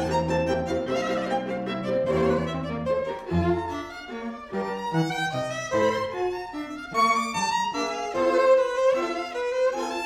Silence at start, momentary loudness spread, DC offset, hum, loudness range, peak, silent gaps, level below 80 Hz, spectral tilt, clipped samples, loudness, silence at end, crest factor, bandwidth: 0 s; 10 LU; under 0.1%; none; 4 LU; -10 dBFS; none; -50 dBFS; -5.5 dB/octave; under 0.1%; -26 LUFS; 0 s; 16 dB; 15.5 kHz